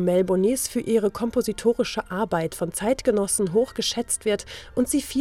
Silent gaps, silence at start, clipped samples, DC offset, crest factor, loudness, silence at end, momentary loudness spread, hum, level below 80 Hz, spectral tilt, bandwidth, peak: none; 0 s; under 0.1%; under 0.1%; 16 dB; -24 LUFS; 0 s; 5 LU; none; -50 dBFS; -4 dB/octave; 17 kHz; -8 dBFS